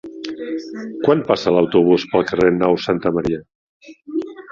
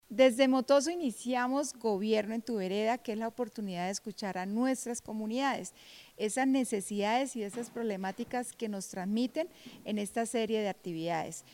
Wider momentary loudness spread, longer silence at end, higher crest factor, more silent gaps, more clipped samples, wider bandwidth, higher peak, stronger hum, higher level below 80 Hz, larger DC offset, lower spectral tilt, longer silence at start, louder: first, 13 LU vs 10 LU; about the same, 0 s vs 0.1 s; about the same, 16 dB vs 20 dB; first, 3.55-3.80 s vs none; neither; second, 7.4 kHz vs 17 kHz; first, -2 dBFS vs -12 dBFS; neither; first, -52 dBFS vs -72 dBFS; neither; first, -7 dB/octave vs -4.5 dB/octave; about the same, 0.05 s vs 0.1 s; first, -18 LUFS vs -33 LUFS